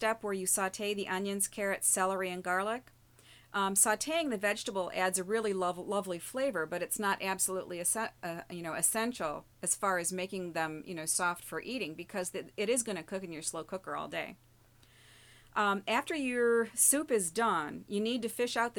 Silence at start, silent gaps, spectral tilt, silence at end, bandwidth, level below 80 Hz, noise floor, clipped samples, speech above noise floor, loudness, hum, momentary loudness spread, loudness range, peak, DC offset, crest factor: 0 s; none; -2.5 dB/octave; 0 s; over 20 kHz; -70 dBFS; -63 dBFS; under 0.1%; 29 dB; -32 LUFS; none; 11 LU; 6 LU; -14 dBFS; under 0.1%; 20 dB